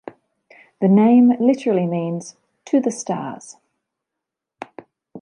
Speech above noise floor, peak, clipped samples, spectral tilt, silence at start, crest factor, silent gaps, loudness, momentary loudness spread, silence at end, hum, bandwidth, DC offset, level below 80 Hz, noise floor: 67 dB; -4 dBFS; under 0.1%; -7.5 dB/octave; 0.8 s; 16 dB; none; -18 LUFS; 25 LU; 0.05 s; none; 10.5 kHz; under 0.1%; -72 dBFS; -83 dBFS